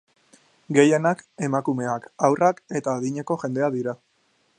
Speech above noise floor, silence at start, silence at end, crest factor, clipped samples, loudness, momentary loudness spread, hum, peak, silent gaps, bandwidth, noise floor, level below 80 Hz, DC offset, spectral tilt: 44 dB; 0.7 s; 0.65 s; 22 dB; under 0.1%; -23 LUFS; 10 LU; none; -2 dBFS; none; 10 kHz; -66 dBFS; -72 dBFS; under 0.1%; -6 dB/octave